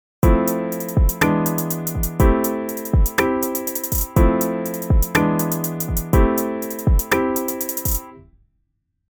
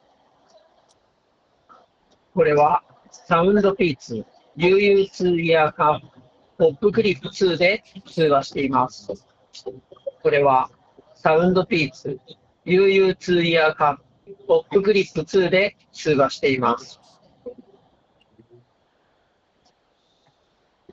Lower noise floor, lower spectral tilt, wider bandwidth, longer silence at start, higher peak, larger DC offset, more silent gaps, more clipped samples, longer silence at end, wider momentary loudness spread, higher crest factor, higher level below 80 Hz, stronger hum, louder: first, -71 dBFS vs -65 dBFS; about the same, -5.5 dB/octave vs -6 dB/octave; first, over 20 kHz vs 7.8 kHz; second, 0.25 s vs 2.35 s; about the same, -2 dBFS vs -2 dBFS; neither; neither; neither; second, 0.9 s vs 3.4 s; second, 6 LU vs 19 LU; about the same, 18 dB vs 20 dB; first, -24 dBFS vs -56 dBFS; neither; about the same, -20 LUFS vs -19 LUFS